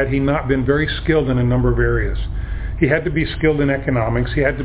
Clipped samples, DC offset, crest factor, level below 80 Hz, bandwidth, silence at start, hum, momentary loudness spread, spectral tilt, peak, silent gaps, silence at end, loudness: under 0.1%; under 0.1%; 16 dB; -26 dBFS; 4 kHz; 0 s; none; 7 LU; -11 dB/octave; 0 dBFS; none; 0 s; -18 LUFS